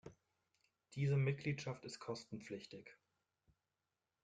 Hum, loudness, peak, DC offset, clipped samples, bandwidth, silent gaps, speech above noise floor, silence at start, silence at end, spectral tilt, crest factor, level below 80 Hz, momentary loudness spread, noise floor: none; -43 LUFS; -26 dBFS; under 0.1%; under 0.1%; 9 kHz; none; over 48 dB; 0.05 s; 1.3 s; -6.5 dB/octave; 18 dB; -76 dBFS; 20 LU; under -90 dBFS